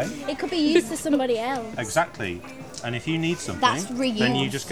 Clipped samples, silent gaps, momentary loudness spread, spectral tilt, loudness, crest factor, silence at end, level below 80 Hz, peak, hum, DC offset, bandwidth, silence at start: under 0.1%; none; 10 LU; -4.5 dB/octave; -24 LUFS; 20 dB; 0 s; -56 dBFS; -4 dBFS; none; 0.3%; 17 kHz; 0 s